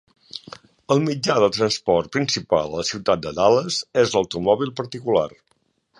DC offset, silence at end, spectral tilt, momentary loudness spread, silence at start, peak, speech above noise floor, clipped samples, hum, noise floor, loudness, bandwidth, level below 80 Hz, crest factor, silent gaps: under 0.1%; 0.7 s; -4.5 dB/octave; 10 LU; 0.35 s; -4 dBFS; 47 dB; under 0.1%; none; -67 dBFS; -21 LUFS; 11.5 kHz; -54 dBFS; 18 dB; none